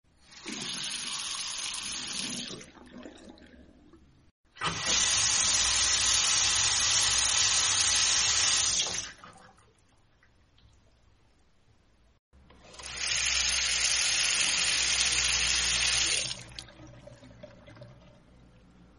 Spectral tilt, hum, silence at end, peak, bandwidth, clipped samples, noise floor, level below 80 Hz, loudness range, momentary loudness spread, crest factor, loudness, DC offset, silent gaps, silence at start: 1 dB/octave; none; 1.05 s; -12 dBFS; 11.5 kHz; under 0.1%; -64 dBFS; -52 dBFS; 13 LU; 14 LU; 18 dB; -25 LUFS; under 0.1%; 4.31-4.44 s, 12.19-12.31 s; 0.3 s